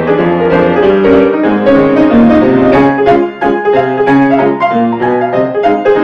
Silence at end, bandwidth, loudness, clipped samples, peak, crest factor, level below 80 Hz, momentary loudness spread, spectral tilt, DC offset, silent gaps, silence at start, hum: 0 s; 6.4 kHz; -9 LUFS; under 0.1%; 0 dBFS; 8 dB; -38 dBFS; 5 LU; -8.5 dB/octave; under 0.1%; none; 0 s; none